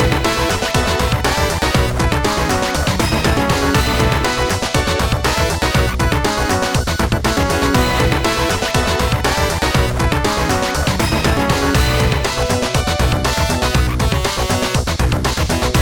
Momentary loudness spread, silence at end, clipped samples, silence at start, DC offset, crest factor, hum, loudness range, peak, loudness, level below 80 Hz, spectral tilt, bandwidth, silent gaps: 2 LU; 0 s; under 0.1%; 0 s; 0.3%; 16 dB; none; 1 LU; 0 dBFS; -16 LUFS; -22 dBFS; -4.5 dB/octave; 19 kHz; none